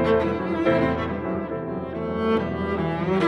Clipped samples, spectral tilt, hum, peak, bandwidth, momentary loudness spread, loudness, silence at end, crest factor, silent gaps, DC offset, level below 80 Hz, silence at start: under 0.1%; -8 dB/octave; none; -8 dBFS; 9.8 kHz; 8 LU; -25 LUFS; 0 s; 16 dB; none; under 0.1%; -44 dBFS; 0 s